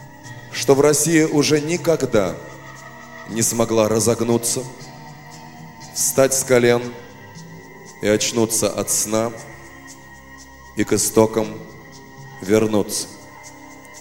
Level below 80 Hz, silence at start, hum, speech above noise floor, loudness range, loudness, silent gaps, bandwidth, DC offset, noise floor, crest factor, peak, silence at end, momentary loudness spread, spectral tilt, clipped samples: -50 dBFS; 0 s; 50 Hz at -55 dBFS; 24 dB; 3 LU; -18 LUFS; none; 17 kHz; 0.3%; -42 dBFS; 20 dB; 0 dBFS; 0 s; 24 LU; -4 dB/octave; under 0.1%